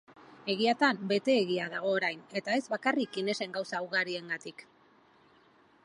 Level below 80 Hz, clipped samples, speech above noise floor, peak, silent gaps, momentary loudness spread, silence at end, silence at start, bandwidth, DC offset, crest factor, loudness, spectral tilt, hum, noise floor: -84 dBFS; under 0.1%; 32 dB; -12 dBFS; none; 10 LU; 1.2 s; 0.1 s; 11.5 kHz; under 0.1%; 22 dB; -31 LUFS; -4.5 dB/octave; none; -63 dBFS